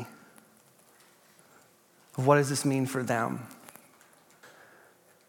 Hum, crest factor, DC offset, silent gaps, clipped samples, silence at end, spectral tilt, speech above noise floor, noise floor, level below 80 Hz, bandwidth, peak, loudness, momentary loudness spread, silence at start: none; 24 dB; under 0.1%; none; under 0.1%; 0.8 s; -5.5 dB/octave; 35 dB; -62 dBFS; -84 dBFS; 17.5 kHz; -8 dBFS; -28 LUFS; 23 LU; 0 s